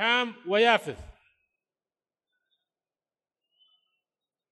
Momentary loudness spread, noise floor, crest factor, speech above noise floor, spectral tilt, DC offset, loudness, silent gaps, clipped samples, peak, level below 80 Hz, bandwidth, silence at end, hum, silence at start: 19 LU; under -90 dBFS; 24 dB; over 65 dB; -3.5 dB/octave; under 0.1%; -24 LUFS; none; under 0.1%; -8 dBFS; -62 dBFS; 12 kHz; 3.4 s; none; 0 s